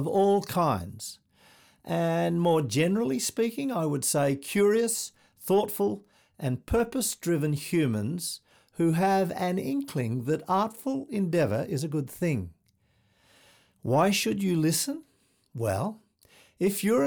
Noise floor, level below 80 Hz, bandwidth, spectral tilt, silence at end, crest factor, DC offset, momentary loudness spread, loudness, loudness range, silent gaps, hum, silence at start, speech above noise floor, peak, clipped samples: -68 dBFS; -56 dBFS; over 20 kHz; -5 dB/octave; 0 s; 16 dB; under 0.1%; 10 LU; -27 LUFS; 3 LU; none; none; 0 s; 42 dB; -12 dBFS; under 0.1%